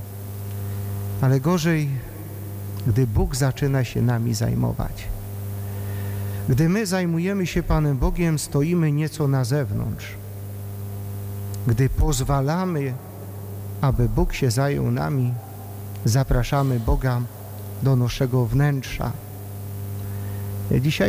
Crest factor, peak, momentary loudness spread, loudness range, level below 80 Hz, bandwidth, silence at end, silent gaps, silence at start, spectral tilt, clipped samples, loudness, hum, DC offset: 14 dB; -8 dBFS; 13 LU; 3 LU; -32 dBFS; 16.5 kHz; 0 s; none; 0 s; -6.5 dB/octave; under 0.1%; -23 LUFS; none; under 0.1%